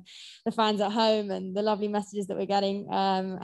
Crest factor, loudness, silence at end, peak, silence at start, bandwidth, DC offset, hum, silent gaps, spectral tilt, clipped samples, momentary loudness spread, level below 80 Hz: 18 dB; -28 LUFS; 0 s; -10 dBFS; 0.1 s; 12 kHz; under 0.1%; none; none; -5.5 dB/octave; under 0.1%; 8 LU; -72 dBFS